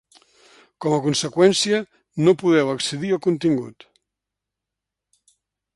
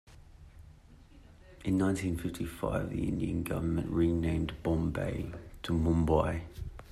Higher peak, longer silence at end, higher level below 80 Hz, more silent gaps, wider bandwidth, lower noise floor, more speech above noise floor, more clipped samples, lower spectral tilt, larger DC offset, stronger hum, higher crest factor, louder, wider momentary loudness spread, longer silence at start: first, -4 dBFS vs -14 dBFS; first, 2.05 s vs 0 s; second, -64 dBFS vs -46 dBFS; neither; second, 11.5 kHz vs 14 kHz; first, -85 dBFS vs -55 dBFS; first, 65 dB vs 24 dB; neither; second, -5 dB/octave vs -7.5 dB/octave; neither; neither; about the same, 18 dB vs 20 dB; first, -20 LUFS vs -32 LUFS; about the same, 9 LU vs 11 LU; first, 0.8 s vs 0.1 s